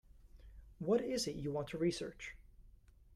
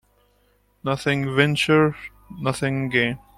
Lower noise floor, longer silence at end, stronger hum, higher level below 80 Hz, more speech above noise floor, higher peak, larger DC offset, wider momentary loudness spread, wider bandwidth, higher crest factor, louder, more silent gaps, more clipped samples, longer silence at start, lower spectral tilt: about the same, -62 dBFS vs -62 dBFS; second, 0 s vs 0.2 s; second, none vs 50 Hz at -50 dBFS; second, -60 dBFS vs -54 dBFS; second, 24 dB vs 41 dB; second, -22 dBFS vs -4 dBFS; neither; about the same, 15 LU vs 13 LU; about the same, 14 kHz vs 15 kHz; about the same, 20 dB vs 20 dB; second, -39 LUFS vs -21 LUFS; neither; neither; second, 0.15 s vs 0.85 s; about the same, -5 dB/octave vs -5.5 dB/octave